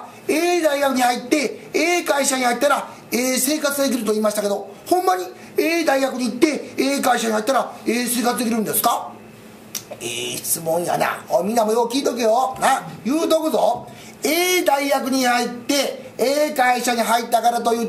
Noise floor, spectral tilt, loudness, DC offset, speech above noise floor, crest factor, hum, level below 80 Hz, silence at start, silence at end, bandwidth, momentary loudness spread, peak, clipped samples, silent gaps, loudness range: -41 dBFS; -2.5 dB/octave; -20 LUFS; under 0.1%; 22 dB; 18 dB; none; -66 dBFS; 0 s; 0 s; 16 kHz; 7 LU; 0 dBFS; under 0.1%; none; 3 LU